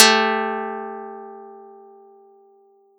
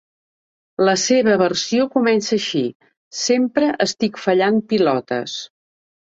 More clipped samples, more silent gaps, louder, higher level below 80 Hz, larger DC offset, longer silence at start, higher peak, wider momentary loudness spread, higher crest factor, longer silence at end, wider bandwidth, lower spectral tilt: neither; second, none vs 2.75-2.80 s, 2.97-3.11 s; about the same, -20 LUFS vs -18 LUFS; second, under -90 dBFS vs -62 dBFS; neither; second, 0 s vs 0.8 s; about the same, 0 dBFS vs -2 dBFS; first, 25 LU vs 12 LU; first, 22 dB vs 16 dB; first, 1.35 s vs 0.65 s; first, 17.5 kHz vs 8 kHz; second, -1 dB/octave vs -4 dB/octave